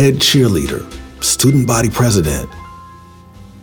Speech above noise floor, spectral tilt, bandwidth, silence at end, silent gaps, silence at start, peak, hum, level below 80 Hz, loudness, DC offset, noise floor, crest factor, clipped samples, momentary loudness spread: 25 dB; -4.5 dB/octave; over 20 kHz; 0.2 s; none; 0 s; 0 dBFS; none; -34 dBFS; -13 LUFS; under 0.1%; -39 dBFS; 14 dB; under 0.1%; 20 LU